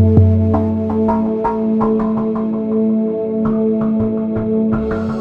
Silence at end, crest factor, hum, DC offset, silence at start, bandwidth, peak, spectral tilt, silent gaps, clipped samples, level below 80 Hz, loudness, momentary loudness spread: 0 s; 14 dB; none; under 0.1%; 0 s; 4 kHz; 0 dBFS; -11.5 dB/octave; none; under 0.1%; -38 dBFS; -16 LUFS; 5 LU